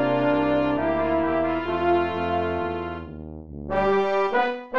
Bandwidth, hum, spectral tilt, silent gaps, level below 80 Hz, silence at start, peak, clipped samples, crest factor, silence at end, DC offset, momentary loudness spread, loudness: 7 kHz; none; -8 dB/octave; none; -46 dBFS; 0 s; -10 dBFS; under 0.1%; 14 dB; 0 s; 0.6%; 13 LU; -23 LUFS